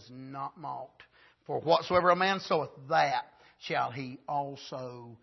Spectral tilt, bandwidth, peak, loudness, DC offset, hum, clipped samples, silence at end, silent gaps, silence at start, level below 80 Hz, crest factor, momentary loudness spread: -5 dB/octave; 6.2 kHz; -10 dBFS; -30 LUFS; under 0.1%; none; under 0.1%; 0.05 s; none; 0 s; -68 dBFS; 22 dB; 17 LU